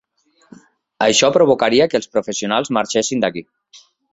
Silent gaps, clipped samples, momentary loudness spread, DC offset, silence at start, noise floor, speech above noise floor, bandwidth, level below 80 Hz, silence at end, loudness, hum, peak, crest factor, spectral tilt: none; under 0.1%; 8 LU; under 0.1%; 1 s; -59 dBFS; 43 dB; 8 kHz; -58 dBFS; 0.35 s; -16 LUFS; none; -2 dBFS; 16 dB; -3 dB/octave